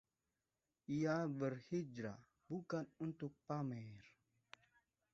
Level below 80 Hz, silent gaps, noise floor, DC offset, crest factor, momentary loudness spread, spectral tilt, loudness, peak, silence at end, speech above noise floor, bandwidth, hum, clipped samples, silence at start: -82 dBFS; none; under -90 dBFS; under 0.1%; 20 dB; 23 LU; -7.5 dB/octave; -45 LUFS; -26 dBFS; 1.05 s; over 46 dB; 7.6 kHz; none; under 0.1%; 0.9 s